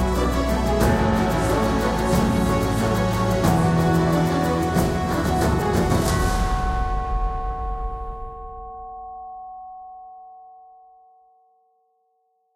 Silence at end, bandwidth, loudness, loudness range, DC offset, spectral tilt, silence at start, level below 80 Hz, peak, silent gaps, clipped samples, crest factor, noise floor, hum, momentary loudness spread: 2 s; 16.5 kHz; -21 LUFS; 19 LU; under 0.1%; -6 dB/octave; 0 s; -30 dBFS; -4 dBFS; none; under 0.1%; 18 dB; -68 dBFS; none; 18 LU